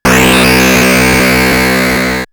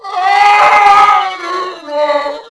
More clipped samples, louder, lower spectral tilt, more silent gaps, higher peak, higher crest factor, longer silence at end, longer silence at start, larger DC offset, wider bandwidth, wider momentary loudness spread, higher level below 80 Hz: second, under 0.1% vs 1%; about the same, -7 LUFS vs -9 LUFS; first, -4 dB/octave vs -1.5 dB/octave; neither; about the same, 0 dBFS vs 0 dBFS; about the same, 8 dB vs 10 dB; about the same, 0.05 s vs 0.15 s; about the same, 0.05 s vs 0.05 s; neither; first, over 20 kHz vs 11 kHz; second, 4 LU vs 13 LU; first, -24 dBFS vs -50 dBFS